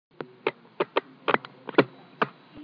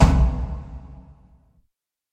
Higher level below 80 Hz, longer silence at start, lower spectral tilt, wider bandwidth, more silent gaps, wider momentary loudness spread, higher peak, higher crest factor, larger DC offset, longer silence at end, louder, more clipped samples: second, -80 dBFS vs -24 dBFS; first, 0.2 s vs 0 s; about the same, -7.5 dB/octave vs -7.5 dB/octave; second, 5.4 kHz vs 9 kHz; neither; second, 8 LU vs 26 LU; about the same, -2 dBFS vs 0 dBFS; about the same, 26 dB vs 22 dB; neither; second, 0 s vs 1.1 s; second, -29 LUFS vs -23 LUFS; neither